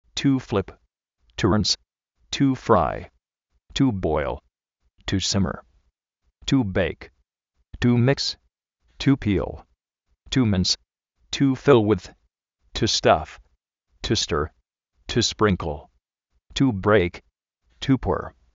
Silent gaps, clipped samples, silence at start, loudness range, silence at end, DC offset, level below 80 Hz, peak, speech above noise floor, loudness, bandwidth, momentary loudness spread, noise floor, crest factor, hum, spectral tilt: none; under 0.1%; 0.15 s; 4 LU; 0.3 s; under 0.1%; -44 dBFS; -2 dBFS; 52 dB; -23 LUFS; 8 kHz; 15 LU; -73 dBFS; 22 dB; none; -5 dB/octave